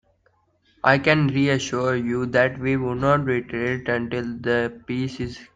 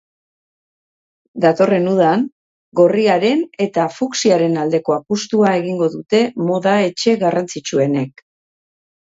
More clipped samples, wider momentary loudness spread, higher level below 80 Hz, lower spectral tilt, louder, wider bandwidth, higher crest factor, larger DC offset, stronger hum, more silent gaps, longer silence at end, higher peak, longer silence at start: neither; first, 9 LU vs 6 LU; first, -52 dBFS vs -64 dBFS; about the same, -6 dB/octave vs -5.5 dB/octave; second, -22 LUFS vs -16 LUFS; first, 9.2 kHz vs 8 kHz; about the same, 20 dB vs 16 dB; neither; neither; second, none vs 2.32-2.72 s; second, 0.1 s vs 1 s; about the same, -2 dBFS vs 0 dBFS; second, 0.85 s vs 1.35 s